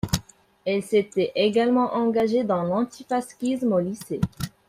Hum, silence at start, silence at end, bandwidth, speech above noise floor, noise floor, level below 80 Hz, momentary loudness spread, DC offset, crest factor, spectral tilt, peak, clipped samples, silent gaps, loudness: none; 0.05 s; 0.2 s; 16 kHz; 21 dB; -44 dBFS; -50 dBFS; 8 LU; under 0.1%; 20 dB; -6 dB/octave; -4 dBFS; under 0.1%; none; -24 LUFS